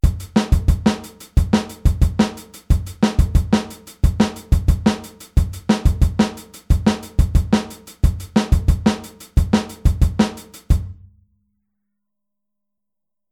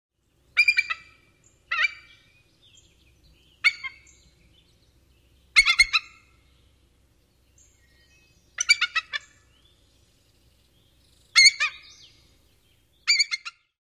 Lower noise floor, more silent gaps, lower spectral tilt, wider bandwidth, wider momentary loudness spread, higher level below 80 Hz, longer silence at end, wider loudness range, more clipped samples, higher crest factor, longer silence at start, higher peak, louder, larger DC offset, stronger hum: first, -86 dBFS vs -63 dBFS; neither; first, -6.5 dB/octave vs 3.5 dB/octave; about the same, 15.5 kHz vs 15.5 kHz; second, 6 LU vs 19 LU; first, -22 dBFS vs -58 dBFS; first, 2.4 s vs 0.4 s; second, 3 LU vs 7 LU; neither; second, 16 dB vs 24 dB; second, 0.05 s vs 0.55 s; about the same, -2 dBFS vs -4 dBFS; about the same, -20 LUFS vs -21 LUFS; neither; neither